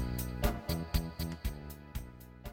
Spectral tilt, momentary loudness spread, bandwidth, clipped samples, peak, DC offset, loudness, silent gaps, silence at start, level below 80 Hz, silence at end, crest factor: -5.5 dB/octave; 12 LU; 17 kHz; under 0.1%; -16 dBFS; under 0.1%; -38 LUFS; none; 0 s; -40 dBFS; 0 s; 22 dB